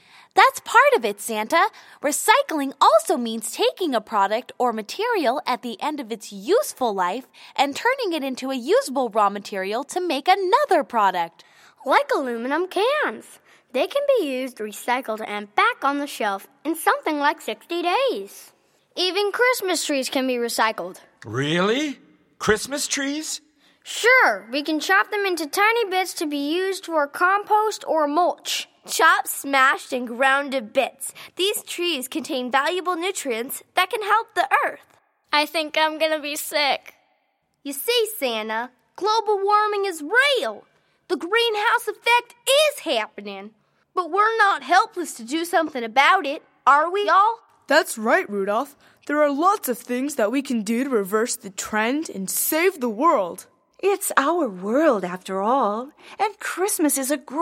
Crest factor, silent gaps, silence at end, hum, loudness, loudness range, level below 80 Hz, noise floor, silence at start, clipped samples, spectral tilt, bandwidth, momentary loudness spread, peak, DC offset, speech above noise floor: 20 dB; none; 0 s; none; -21 LUFS; 4 LU; -68 dBFS; -70 dBFS; 0.35 s; under 0.1%; -2.5 dB/octave; 16.5 kHz; 11 LU; -2 dBFS; under 0.1%; 48 dB